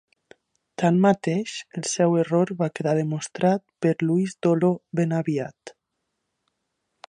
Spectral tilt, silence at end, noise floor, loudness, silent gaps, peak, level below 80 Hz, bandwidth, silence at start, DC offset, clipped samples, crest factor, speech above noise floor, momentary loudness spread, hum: -6.5 dB/octave; 1.4 s; -79 dBFS; -23 LUFS; none; -6 dBFS; -70 dBFS; 10.5 kHz; 0.8 s; under 0.1%; under 0.1%; 18 dB; 56 dB; 9 LU; none